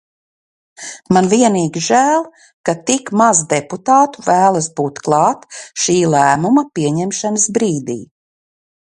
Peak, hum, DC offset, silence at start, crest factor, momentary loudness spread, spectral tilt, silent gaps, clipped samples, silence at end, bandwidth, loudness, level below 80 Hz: 0 dBFS; none; under 0.1%; 0.8 s; 16 dB; 13 LU; -4.5 dB/octave; 2.53-2.64 s; under 0.1%; 0.8 s; 11.5 kHz; -14 LUFS; -58 dBFS